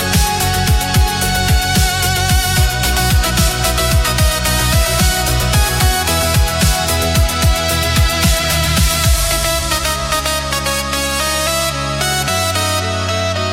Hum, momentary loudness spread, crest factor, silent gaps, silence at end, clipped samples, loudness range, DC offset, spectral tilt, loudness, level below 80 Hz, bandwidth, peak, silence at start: none; 3 LU; 12 dB; none; 0 s; under 0.1%; 2 LU; under 0.1%; -3 dB/octave; -14 LUFS; -20 dBFS; 17 kHz; -2 dBFS; 0 s